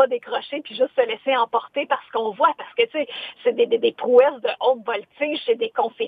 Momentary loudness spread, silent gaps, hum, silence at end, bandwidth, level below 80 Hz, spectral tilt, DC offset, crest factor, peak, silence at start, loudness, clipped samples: 10 LU; none; none; 0 s; 4.8 kHz; -80 dBFS; -6 dB/octave; under 0.1%; 18 dB; -2 dBFS; 0 s; -22 LUFS; under 0.1%